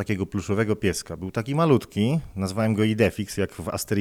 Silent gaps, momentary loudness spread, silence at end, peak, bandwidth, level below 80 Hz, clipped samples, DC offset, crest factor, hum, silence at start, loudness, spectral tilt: none; 9 LU; 0 s; -6 dBFS; 16.5 kHz; -50 dBFS; under 0.1%; under 0.1%; 18 dB; none; 0 s; -25 LUFS; -6 dB/octave